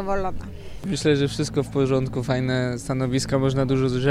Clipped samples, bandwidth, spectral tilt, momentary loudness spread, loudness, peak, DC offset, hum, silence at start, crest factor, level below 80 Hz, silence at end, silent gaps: under 0.1%; 13 kHz; -6 dB/octave; 9 LU; -23 LUFS; -6 dBFS; under 0.1%; none; 0 s; 16 dB; -40 dBFS; 0 s; none